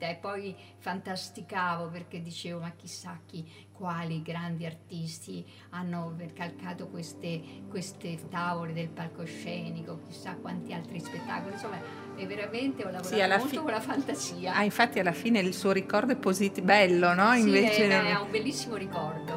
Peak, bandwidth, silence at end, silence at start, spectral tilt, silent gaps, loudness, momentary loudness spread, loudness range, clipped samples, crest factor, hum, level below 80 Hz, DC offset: -6 dBFS; 16 kHz; 0 s; 0 s; -5 dB/octave; none; -30 LUFS; 18 LU; 14 LU; under 0.1%; 24 dB; none; -76 dBFS; under 0.1%